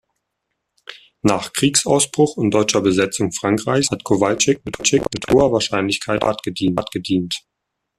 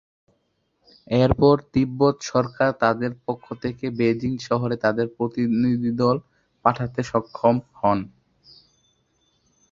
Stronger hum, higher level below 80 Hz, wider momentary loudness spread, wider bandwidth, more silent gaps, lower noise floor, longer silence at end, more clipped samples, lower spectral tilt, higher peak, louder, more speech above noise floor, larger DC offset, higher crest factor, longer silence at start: neither; about the same, -48 dBFS vs -48 dBFS; second, 6 LU vs 9 LU; first, 14 kHz vs 7.4 kHz; neither; first, -76 dBFS vs -70 dBFS; second, 0.6 s vs 1.65 s; neither; second, -4 dB/octave vs -7 dB/octave; about the same, -2 dBFS vs -2 dBFS; first, -18 LUFS vs -22 LUFS; first, 58 dB vs 49 dB; neither; about the same, 18 dB vs 20 dB; second, 0.9 s vs 1.1 s